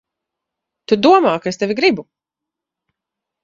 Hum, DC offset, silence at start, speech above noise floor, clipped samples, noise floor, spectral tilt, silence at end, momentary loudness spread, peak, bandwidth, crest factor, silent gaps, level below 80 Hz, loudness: none; under 0.1%; 0.9 s; 70 dB; under 0.1%; -84 dBFS; -5 dB/octave; 1.4 s; 9 LU; 0 dBFS; 7.6 kHz; 18 dB; none; -60 dBFS; -15 LUFS